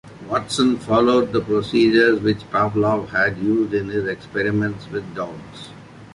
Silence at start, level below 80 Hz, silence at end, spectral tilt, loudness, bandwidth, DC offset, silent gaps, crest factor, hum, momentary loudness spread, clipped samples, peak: 0.05 s; -50 dBFS; 0.05 s; -6 dB/octave; -20 LUFS; 11.5 kHz; under 0.1%; none; 16 dB; none; 14 LU; under 0.1%; -4 dBFS